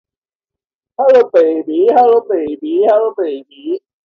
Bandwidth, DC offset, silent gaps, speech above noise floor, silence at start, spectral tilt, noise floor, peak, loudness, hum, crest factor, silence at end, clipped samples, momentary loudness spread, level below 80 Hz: 6 kHz; under 0.1%; none; 75 dB; 1 s; -6.5 dB/octave; -87 dBFS; 0 dBFS; -13 LUFS; none; 12 dB; 0.25 s; under 0.1%; 14 LU; -64 dBFS